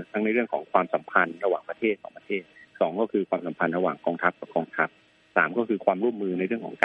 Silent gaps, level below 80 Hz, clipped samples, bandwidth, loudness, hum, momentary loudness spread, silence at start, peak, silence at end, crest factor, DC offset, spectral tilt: none; -74 dBFS; under 0.1%; 4.6 kHz; -27 LUFS; none; 6 LU; 0 s; -2 dBFS; 0 s; 24 dB; under 0.1%; -7.5 dB/octave